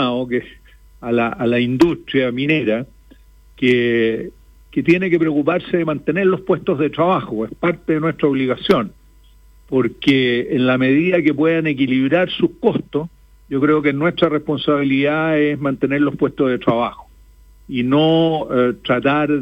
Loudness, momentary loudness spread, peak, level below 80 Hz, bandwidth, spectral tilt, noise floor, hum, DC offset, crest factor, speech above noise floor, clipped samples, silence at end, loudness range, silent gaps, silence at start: -17 LUFS; 8 LU; -2 dBFS; -48 dBFS; 8.4 kHz; -7.5 dB/octave; -47 dBFS; none; under 0.1%; 16 dB; 31 dB; under 0.1%; 0 s; 2 LU; none; 0 s